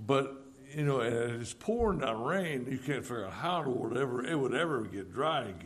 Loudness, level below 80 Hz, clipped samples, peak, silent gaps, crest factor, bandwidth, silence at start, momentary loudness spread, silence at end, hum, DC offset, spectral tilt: -33 LUFS; -54 dBFS; under 0.1%; -14 dBFS; none; 18 dB; 14 kHz; 0 s; 6 LU; 0 s; none; under 0.1%; -6 dB/octave